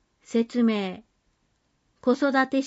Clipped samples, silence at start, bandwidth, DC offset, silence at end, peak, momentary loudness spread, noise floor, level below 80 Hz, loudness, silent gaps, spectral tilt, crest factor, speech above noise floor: under 0.1%; 0.3 s; 8 kHz; under 0.1%; 0 s; -10 dBFS; 10 LU; -71 dBFS; -70 dBFS; -25 LUFS; none; -5.5 dB/octave; 16 dB; 47 dB